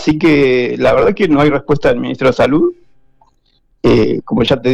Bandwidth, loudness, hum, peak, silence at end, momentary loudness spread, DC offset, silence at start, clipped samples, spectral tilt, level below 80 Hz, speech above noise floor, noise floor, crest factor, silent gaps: 9.8 kHz; -12 LUFS; none; -4 dBFS; 0 s; 4 LU; under 0.1%; 0 s; under 0.1%; -7 dB/octave; -36 dBFS; 44 dB; -56 dBFS; 10 dB; none